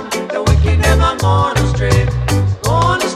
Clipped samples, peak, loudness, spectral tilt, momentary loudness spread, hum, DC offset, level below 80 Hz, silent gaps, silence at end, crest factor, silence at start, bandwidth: under 0.1%; 0 dBFS; -14 LUFS; -5.5 dB/octave; 4 LU; none; under 0.1%; -20 dBFS; none; 0 s; 12 dB; 0 s; 15 kHz